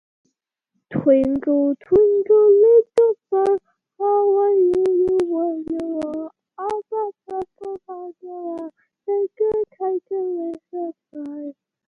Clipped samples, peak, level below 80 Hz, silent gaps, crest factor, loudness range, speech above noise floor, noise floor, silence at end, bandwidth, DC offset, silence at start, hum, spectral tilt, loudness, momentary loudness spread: under 0.1%; -4 dBFS; -56 dBFS; none; 16 dB; 12 LU; 56 dB; -75 dBFS; 0.35 s; 5.8 kHz; under 0.1%; 0.9 s; none; -8.5 dB/octave; -19 LUFS; 18 LU